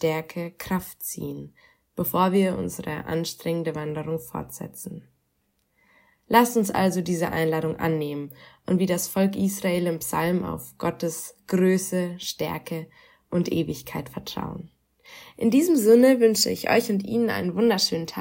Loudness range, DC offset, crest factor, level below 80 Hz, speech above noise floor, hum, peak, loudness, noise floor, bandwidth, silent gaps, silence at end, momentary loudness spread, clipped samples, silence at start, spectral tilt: 9 LU; under 0.1%; 20 dB; -58 dBFS; 47 dB; none; -4 dBFS; -24 LUFS; -72 dBFS; 16.5 kHz; none; 0 s; 15 LU; under 0.1%; 0 s; -5 dB/octave